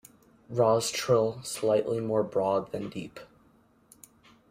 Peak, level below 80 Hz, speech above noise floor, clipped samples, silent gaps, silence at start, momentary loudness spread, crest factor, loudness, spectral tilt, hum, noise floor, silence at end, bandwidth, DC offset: -10 dBFS; -66 dBFS; 35 dB; under 0.1%; none; 0.5 s; 14 LU; 18 dB; -28 LUFS; -5 dB/octave; none; -63 dBFS; 1.25 s; 16 kHz; under 0.1%